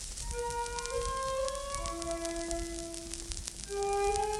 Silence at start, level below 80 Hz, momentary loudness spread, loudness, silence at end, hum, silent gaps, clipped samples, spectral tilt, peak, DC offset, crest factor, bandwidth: 0 s; -44 dBFS; 8 LU; -36 LUFS; 0 s; none; none; under 0.1%; -3 dB/octave; -12 dBFS; under 0.1%; 24 dB; 16 kHz